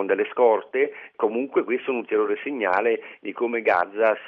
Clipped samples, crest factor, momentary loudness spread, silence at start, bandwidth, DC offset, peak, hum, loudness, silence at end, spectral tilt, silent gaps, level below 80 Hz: under 0.1%; 16 dB; 7 LU; 0 s; 5.2 kHz; under 0.1%; -6 dBFS; none; -23 LUFS; 0 s; -7 dB/octave; none; -74 dBFS